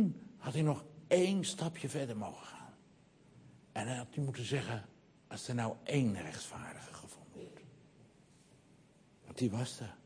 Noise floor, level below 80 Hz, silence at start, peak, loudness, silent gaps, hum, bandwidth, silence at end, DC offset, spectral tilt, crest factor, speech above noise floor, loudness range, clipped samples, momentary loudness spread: -65 dBFS; -74 dBFS; 0 s; -16 dBFS; -38 LUFS; none; none; 10.5 kHz; 0.1 s; under 0.1%; -5.5 dB/octave; 24 dB; 28 dB; 8 LU; under 0.1%; 19 LU